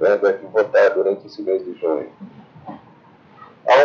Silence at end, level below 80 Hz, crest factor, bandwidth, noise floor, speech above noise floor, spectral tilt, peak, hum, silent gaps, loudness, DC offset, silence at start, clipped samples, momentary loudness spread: 0 s; -74 dBFS; 14 dB; 7.2 kHz; -48 dBFS; 30 dB; -5 dB/octave; -4 dBFS; none; none; -19 LUFS; under 0.1%; 0 s; under 0.1%; 24 LU